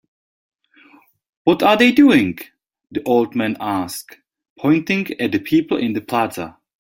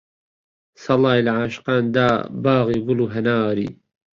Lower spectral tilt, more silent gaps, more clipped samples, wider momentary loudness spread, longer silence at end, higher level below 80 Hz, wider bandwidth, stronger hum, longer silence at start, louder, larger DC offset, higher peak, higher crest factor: second, -5.5 dB/octave vs -7.5 dB/octave; first, 4.50-4.56 s vs none; neither; first, 16 LU vs 6 LU; about the same, 0.35 s vs 0.4 s; about the same, -58 dBFS vs -54 dBFS; first, 16.5 kHz vs 7.4 kHz; neither; first, 1.45 s vs 0.8 s; about the same, -17 LUFS vs -19 LUFS; neither; about the same, -2 dBFS vs -4 dBFS; about the same, 18 dB vs 16 dB